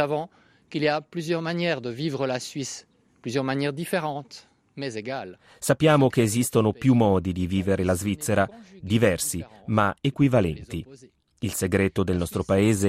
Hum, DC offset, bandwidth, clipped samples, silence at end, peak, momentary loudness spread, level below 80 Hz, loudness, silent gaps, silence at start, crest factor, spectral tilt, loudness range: none; under 0.1%; 15.5 kHz; under 0.1%; 0 s; -6 dBFS; 14 LU; -54 dBFS; -25 LUFS; none; 0 s; 18 dB; -5.5 dB/octave; 7 LU